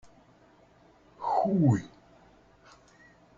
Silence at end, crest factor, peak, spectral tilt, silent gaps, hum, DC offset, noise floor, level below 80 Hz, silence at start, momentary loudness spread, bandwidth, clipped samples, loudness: 1.5 s; 20 dB; -12 dBFS; -9 dB/octave; none; none; under 0.1%; -60 dBFS; -64 dBFS; 1.2 s; 14 LU; 7.6 kHz; under 0.1%; -27 LUFS